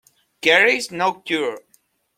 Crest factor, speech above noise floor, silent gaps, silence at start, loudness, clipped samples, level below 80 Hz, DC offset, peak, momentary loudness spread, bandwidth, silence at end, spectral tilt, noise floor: 20 dB; 43 dB; none; 0.45 s; -18 LUFS; under 0.1%; -68 dBFS; under 0.1%; -2 dBFS; 12 LU; 16 kHz; 0.6 s; -2.5 dB/octave; -61 dBFS